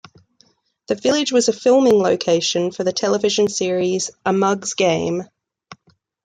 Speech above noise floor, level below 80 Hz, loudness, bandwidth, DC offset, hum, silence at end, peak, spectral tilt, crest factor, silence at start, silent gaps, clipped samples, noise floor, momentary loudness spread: 42 dB; -62 dBFS; -18 LUFS; 9.6 kHz; under 0.1%; none; 0.5 s; -4 dBFS; -4 dB/octave; 14 dB; 0.9 s; none; under 0.1%; -60 dBFS; 7 LU